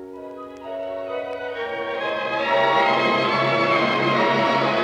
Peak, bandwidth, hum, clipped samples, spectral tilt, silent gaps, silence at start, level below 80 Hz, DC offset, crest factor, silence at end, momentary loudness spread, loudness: -8 dBFS; 10.5 kHz; none; under 0.1%; -5.5 dB/octave; none; 0 s; -64 dBFS; under 0.1%; 14 dB; 0 s; 15 LU; -21 LUFS